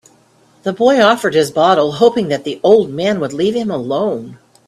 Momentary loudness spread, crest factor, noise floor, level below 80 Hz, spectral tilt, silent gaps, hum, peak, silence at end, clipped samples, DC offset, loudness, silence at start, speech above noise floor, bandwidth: 8 LU; 14 dB; -51 dBFS; -56 dBFS; -5 dB/octave; none; none; 0 dBFS; 0.3 s; under 0.1%; under 0.1%; -14 LUFS; 0.65 s; 38 dB; 13.5 kHz